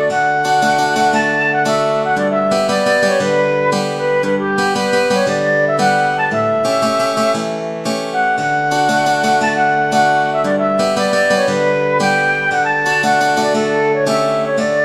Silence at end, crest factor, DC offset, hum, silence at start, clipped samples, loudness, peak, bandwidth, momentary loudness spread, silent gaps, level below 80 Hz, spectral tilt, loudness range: 0 s; 12 dB; under 0.1%; none; 0 s; under 0.1%; -15 LUFS; -2 dBFS; 14.5 kHz; 3 LU; none; -62 dBFS; -4 dB/octave; 1 LU